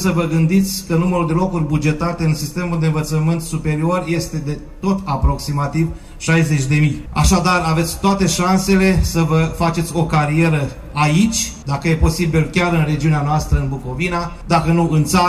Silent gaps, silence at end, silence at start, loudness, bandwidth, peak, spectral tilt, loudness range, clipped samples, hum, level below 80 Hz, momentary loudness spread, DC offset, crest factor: none; 0 s; 0 s; -17 LUFS; 14.5 kHz; -4 dBFS; -5.5 dB/octave; 4 LU; under 0.1%; none; -28 dBFS; 6 LU; under 0.1%; 12 dB